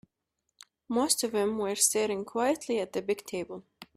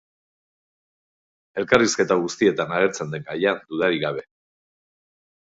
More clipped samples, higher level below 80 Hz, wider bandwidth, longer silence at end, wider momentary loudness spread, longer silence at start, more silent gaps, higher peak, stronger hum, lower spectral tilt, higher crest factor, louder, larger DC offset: neither; second, -68 dBFS vs -60 dBFS; first, 15.5 kHz vs 8 kHz; second, 0.1 s vs 1.2 s; about the same, 12 LU vs 12 LU; second, 0.9 s vs 1.55 s; neither; second, -10 dBFS vs 0 dBFS; neither; second, -2.5 dB/octave vs -4 dB/octave; about the same, 22 dB vs 24 dB; second, -29 LUFS vs -22 LUFS; neither